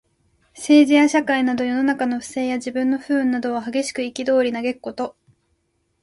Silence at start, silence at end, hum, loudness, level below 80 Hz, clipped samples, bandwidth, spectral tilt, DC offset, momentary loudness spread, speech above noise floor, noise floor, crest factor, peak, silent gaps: 0.55 s; 0.9 s; none; -20 LUFS; -62 dBFS; under 0.1%; 11.5 kHz; -3.5 dB/octave; under 0.1%; 12 LU; 49 dB; -68 dBFS; 16 dB; -4 dBFS; none